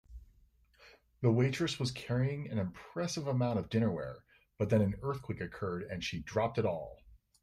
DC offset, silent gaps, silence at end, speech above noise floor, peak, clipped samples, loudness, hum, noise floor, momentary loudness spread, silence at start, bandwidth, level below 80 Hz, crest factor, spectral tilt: under 0.1%; none; 0.25 s; 33 dB; -16 dBFS; under 0.1%; -35 LUFS; none; -67 dBFS; 10 LU; 0.1 s; 13 kHz; -60 dBFS; 20 dB; -6.5 dB/octave